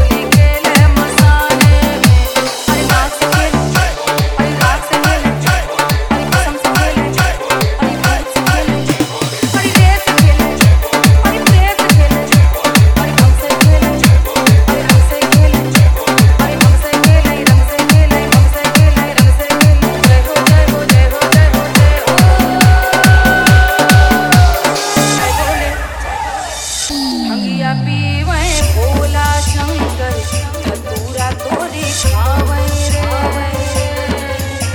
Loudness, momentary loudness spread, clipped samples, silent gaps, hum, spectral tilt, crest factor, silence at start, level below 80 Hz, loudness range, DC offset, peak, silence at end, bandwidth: -11 LUFS; 8 LU; 0.3%; none; none; -5 dB/octave; 10 dB; 0 s; -16 dBFS; 7 LU; under 0.1%; 0 dBFS; 0 s; over 20 kHz